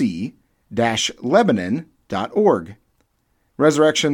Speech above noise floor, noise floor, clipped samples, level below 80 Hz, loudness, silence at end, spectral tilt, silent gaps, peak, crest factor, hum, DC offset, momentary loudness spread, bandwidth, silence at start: 48 dB; -66 dBFS; under 0.1%; -58 dBFS; -19 LUFS; 0 s; -4.5 dB/octave; none; -2 dBFS; 18 dB; none; under 0.1%; 13 LU; 16.5 kHz; 0 s